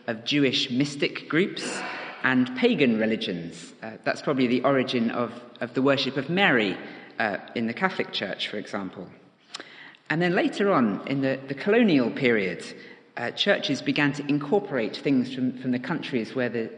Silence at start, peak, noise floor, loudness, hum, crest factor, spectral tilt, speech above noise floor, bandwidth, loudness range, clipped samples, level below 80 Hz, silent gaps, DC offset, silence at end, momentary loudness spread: 0.05 s; -6 dBFS; -46 dBFS; -25 LUFS; none; 20 dB; -5.5 dB/octave; 21 dB; 10 kHz; 3 LU; under 0.1%; -74 dBFS; none; under 0.1%; 0 s; 15 LU